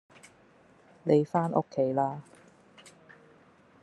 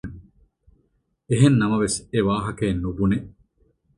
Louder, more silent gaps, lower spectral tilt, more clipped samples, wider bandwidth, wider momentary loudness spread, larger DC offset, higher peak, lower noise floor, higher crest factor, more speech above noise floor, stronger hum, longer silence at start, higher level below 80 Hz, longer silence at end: second, -28 LUFS vs -22 LUFS; neither; first, -8.5 dB/octave vs -6 dB/octave; neither; about the same, 11 kHz vs 11.5 kHz; about the same, 10 LU vs 9 LU; neither; second, -10 dBFS vs -4 dBFS; second, -60 dBFS vs -68 dBFS; about the same, 22 dB vs 20 dB; second, 33 dB vs 48 dB; neither; first, 1.05 s vs 0.05 s; second, -76 dBFS vs -44 dBFS; first, 1.6 s vs 0.7 s